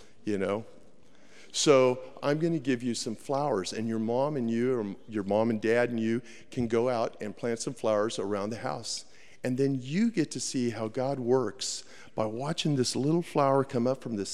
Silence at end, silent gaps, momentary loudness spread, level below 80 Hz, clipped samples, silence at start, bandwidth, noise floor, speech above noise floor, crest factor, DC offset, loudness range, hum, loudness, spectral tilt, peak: 0 s; none; 8 LU; -68 dBFS; under 0.1%; 0.25 s; 13.5 kHz; -59 dBFS; 30 dB; 20 dB; 0.4%; 3 LU; none; -29 LUFS; -5 dB/octave; -10 dBFS